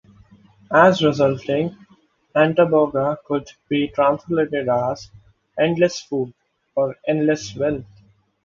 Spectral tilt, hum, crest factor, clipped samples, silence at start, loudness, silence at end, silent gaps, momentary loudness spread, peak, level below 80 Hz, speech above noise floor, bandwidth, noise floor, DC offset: -6 dB/octave; none; 20 dB; under 0.1%; 0.7 s; -20 LUFS; 0.6 s; none; 11 LU; 0 dBFS; -56 dBFS; 38 dB; 7.6 kHz; -57 dBFS; under 0.1%